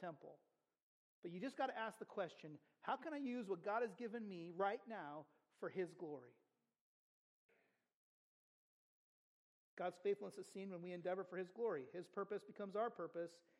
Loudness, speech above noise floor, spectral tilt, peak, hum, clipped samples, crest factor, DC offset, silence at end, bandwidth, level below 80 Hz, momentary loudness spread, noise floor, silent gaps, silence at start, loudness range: -48 LUFS; 34 dB; -6 dB/octave; -28 dBFS; none; under 0.1%; 20 dB; under 0.1%; 0.2 s; 12 kHz; under -90 dBFS; 11 LU; -82 dBFS; 0.82-1.23 s, 6.81-7.49 s, 7.94-9.77 s; 0 s; 9 LU